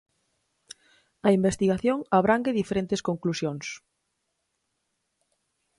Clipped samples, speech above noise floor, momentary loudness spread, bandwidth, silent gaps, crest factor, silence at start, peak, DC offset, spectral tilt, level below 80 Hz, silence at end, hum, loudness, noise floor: under 0.1%; 53 dB; 10 LU; 11.5 kHz; none; 20 dB; 1.25 s; -8 dBFS; under 0.1%; -6 dB/octave; -58 dBFS; 2 s; none; -25 LUFS; -78 dBFS